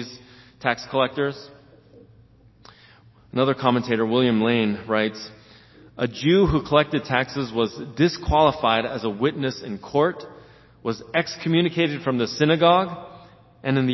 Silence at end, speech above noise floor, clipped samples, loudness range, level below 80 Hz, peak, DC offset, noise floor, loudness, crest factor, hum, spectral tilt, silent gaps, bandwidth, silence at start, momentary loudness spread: 0 s; 31 dB; under 0.1%; 5 LU; -44 dBFS; -2 dBFS; under 0.1%; -53 dBFS; -22 LUFS; 20 dB; none; -6.5 dB/octave; none; 6.2 kHz; 0 s; 12 LU